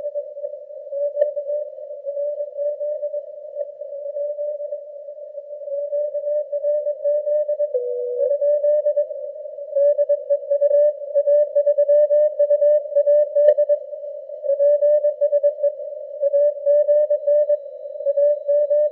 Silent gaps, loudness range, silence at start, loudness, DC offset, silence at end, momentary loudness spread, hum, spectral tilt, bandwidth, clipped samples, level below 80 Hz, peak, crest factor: none; 10 LU; 0 s; -20 LUFS; under 0.1%; 0 s; 15 LU; none; -5 dB/octave; 2 kHz; under 0.1%; under -90 dBFS; -2 dBFS; 18 dB